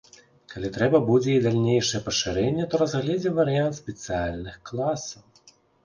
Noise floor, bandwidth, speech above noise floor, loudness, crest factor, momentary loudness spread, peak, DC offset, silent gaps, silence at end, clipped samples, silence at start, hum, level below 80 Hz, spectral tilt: -57 dBFS; 10 kHz; 33 dB; -24 LUFS; 18 dB; 14 LU; -6 dBFS; under 0.1%; none; 0.65 s; under 0.1%; 0.5 s; none; -50 dBFS; -5.5 dB/octave